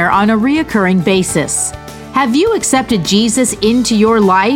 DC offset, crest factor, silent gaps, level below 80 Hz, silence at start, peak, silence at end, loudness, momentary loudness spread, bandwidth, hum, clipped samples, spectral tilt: under 0.1%; 12 dB; none; -40 dBFS; 0 s; 0 dBFS; 0 s; -12 LUFS; 6 LU; 17 kHz; none; under 0.1%; -4 dB/octave